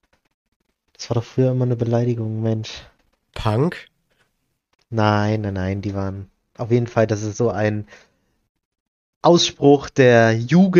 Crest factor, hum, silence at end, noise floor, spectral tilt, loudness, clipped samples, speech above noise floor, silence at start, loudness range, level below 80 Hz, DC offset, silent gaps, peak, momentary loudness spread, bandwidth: 18 dB; none; 0 s; -71 dBFS; -6 dB/octave; -19 LUFS; under 0.1%; 53 dB; 1 s; 6 LU; -50 dBFS; under 0.1%; 8.49-8.55 s, 8.65-8.71 s, 8.80-9.21 s; -2 dBFS; 15 LU; 7.4 kHz